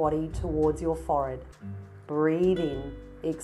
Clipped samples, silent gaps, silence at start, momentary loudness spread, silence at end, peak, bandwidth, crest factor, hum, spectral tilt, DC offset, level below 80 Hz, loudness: under 0.1%; none; 0 s; 17 LU; 0 s; -12 dBFS; 12 kHz; 16 dB; none; -7.5 dB/octave; under 0.1%; -42 dBFS; -28 LUFS